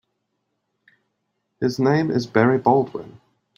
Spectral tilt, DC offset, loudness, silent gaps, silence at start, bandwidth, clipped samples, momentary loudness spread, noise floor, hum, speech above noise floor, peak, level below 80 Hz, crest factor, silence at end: -7.5 dB/octave; under 0.1%; -20 LUFS; none; 1.6 s; 16 kHz; under 0.1%; 10 LU; -75 dBFS; none; 56 dB; -2 dBFS; -60 dBFS; 20 dB; 0.5 s